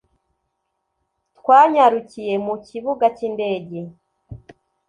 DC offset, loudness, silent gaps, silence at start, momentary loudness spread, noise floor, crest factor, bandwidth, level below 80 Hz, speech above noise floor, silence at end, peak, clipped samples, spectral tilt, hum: under 0.1%; -18 LUFS; none; 1.45 s; 17 LU; -75 dBFS; 18 dB; 10 kHz; -58 dBFS; 57 dB; 0.5 s; -2 dBFS; under 0.1%; -6.5 dB/octave; none